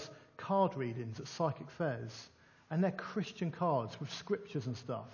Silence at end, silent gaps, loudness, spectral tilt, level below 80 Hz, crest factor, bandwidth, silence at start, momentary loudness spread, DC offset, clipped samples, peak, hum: 0 s; none; -37 LUFS; -6.5 dB/octave; -74 dBFS; 20 dB; 7.2 kHz; 0 s; 12 LU; under 0.1%; under 0.1%; -18 dBFS; none